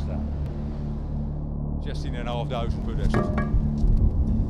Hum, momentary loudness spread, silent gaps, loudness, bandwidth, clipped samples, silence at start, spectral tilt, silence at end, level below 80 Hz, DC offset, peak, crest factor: none; 8 LU; none; -28 LUFS; 7.2 kHz; under 0.1%; 0 s; -8.5 dB/octave; 0 s; -28 dBFS; under 0.1%; -8 dBFS; 16 dB